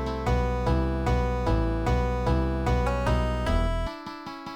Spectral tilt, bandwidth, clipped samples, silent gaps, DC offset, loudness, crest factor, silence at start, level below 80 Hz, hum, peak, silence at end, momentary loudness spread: -7 dB/octave; 10 kHz; under 0.1%; none; under 0.1%; -27 LUFS; 14 dB; 0 s; -28 dBFS; none; -12 dBFS; 0 s; 6 LU